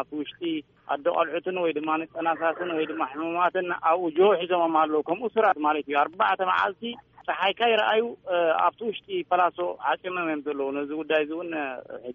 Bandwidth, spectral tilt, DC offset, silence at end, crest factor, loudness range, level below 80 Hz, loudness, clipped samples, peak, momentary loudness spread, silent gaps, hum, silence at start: 6.6 kHz; -1.5 dB/octave; under 0.1%; 0 s; 16 dB; 4 LU; -72 dBFS; -26 LUFS; under 0.1%; -10 dBFS; 10 LU; none; none; 0 s